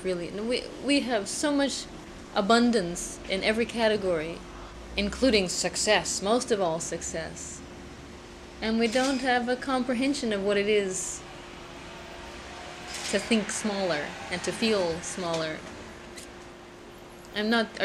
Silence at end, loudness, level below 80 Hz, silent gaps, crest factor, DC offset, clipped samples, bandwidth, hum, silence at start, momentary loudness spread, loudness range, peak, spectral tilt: 0 s; -27 LUFS; -50 dBFS; none; 20 dB; under 0.1%; under 0.1%; 14 kHz; none; 0 s; 19 LU; 5 LU; -8 dBFS; -3.5 dB/octave